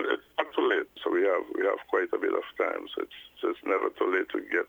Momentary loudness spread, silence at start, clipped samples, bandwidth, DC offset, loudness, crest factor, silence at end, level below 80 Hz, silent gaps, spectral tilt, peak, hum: 7 LU; 0 s; under 0.1%; over 20 kHz; under 0.1%; -29 LUFS; 20 dB; 0.05 s; -74 dBFS; none; -4.5 dB/octave; -8 dBFS; none